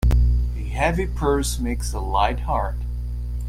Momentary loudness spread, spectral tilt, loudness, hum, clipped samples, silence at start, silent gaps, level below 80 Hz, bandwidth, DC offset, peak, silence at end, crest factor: 9 LU; -5.5 dB/octave; -23 LUFS; 60 Hz at -25 dBFS; under 0.1%; 0 s; none; -24 dBFS; 14.5 kHz; under 0.1%; -6 dBFS; 0 s; 16 dB